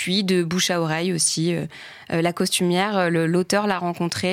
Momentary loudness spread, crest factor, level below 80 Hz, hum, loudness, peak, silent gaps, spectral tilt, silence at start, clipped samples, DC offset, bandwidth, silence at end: 5 LU; 14 dB; -64 dBFS; none; -21 LUFS; -8 dBFS; none; -4 dB/octave; 0 s; under 0.1%; under 0.1%; 16 kHz; 0 s